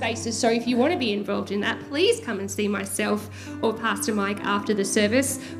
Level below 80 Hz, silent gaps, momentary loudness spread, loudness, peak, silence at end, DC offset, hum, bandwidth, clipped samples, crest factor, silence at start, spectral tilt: -68 dBFS; none; 6 LU; -24 LUFS; -8 dBFS; 0 s; under 0.1%; none; 16 kHz; under 0.1%; 16 dB; 0 s; -3.5 dB/octave